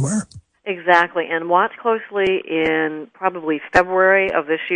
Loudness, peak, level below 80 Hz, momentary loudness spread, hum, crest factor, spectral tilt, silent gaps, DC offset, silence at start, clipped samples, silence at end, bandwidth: -18 LUFS; 0 dBFS; -54 dBFS; 10 LU; none; 18 dB; -5 dB/octave; none; under 0.1%; 0 s; under 0.1%; 0 s; 10.5 kHz